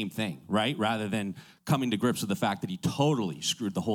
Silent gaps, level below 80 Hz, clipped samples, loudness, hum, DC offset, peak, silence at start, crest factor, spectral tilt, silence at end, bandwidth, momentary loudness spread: none; -66 dBFS; under 0.1%; -29 LUFS; none; under 0.1%; -12 dBFS; 0 s; 16 dB; -5 dB/octave; 0 s; 17.5 kHz; 6 LU